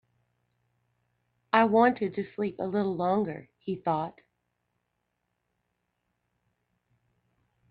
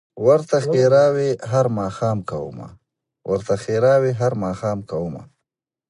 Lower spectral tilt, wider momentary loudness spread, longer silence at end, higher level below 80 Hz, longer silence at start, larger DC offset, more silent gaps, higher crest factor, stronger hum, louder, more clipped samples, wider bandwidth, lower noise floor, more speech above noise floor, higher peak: first, -9 dB/octave vs -7 dB/octave; about the same, 13 LU vs 15 LU; first, 3.6 s vs 0.65 s; second, -72 dBFS vs -52 dBFS; first, 1.55 s vs 0.15 s; neither; neither; first, 26 dB vs 18 dB; first, 60 Hz at -55 dBFS vs none; second, -28 LUFS vs -19 LUFS; neither; second, 5 kHz vs 11 kHz; about the same, -80 dBFS vs -81 dBFS; second, 52 dB vs 63 dB; second, -6 dBFS vs -2 dBFS